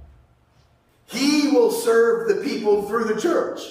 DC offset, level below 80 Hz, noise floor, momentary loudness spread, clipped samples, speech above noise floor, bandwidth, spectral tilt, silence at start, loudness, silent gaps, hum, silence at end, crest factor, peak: under 0.1%; -58 dBFS; -58 dBFS; 6 LU; under 0.1%; 38 dB; 16 kHz; -4 dB/octave; 0 s; -20 LUFS; none; none; 0 s; 14 dB; -6 dBFS